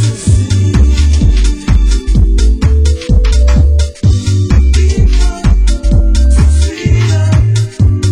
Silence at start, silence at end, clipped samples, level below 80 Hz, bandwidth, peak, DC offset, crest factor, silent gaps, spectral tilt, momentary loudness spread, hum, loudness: 0 s; 0 s; under 0.1%; -10 dBFS; 10.5 kHz; 0 dBFS; under 0.1%; 8 dB; none; -6 dB/octave; 3 LU; none; -11 LUFS